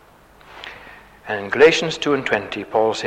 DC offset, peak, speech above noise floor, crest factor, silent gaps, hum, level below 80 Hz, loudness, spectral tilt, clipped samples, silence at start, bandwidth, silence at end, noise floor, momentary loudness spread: under 0.1%; -2 dBFS; 30 dB; 18 dB; none; none; -54 dBFS; -18 LUFS; -4 dB/octave; under 0.1%; 0.5 s; 9.4 kHz; 0 s; -48 dBFS; 23 LU